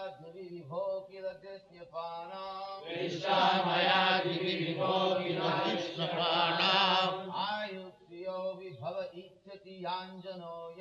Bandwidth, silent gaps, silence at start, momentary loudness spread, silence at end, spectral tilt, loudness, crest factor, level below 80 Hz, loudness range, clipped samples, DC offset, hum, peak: 7.8 kHz; none; 0 s; 20 LU; 0 s; -5 dB/octave; -32 LUFS; 18 dB; -80 dBFS; 10 LU; under 0.1%; under 0.1%; none; -14 dBFS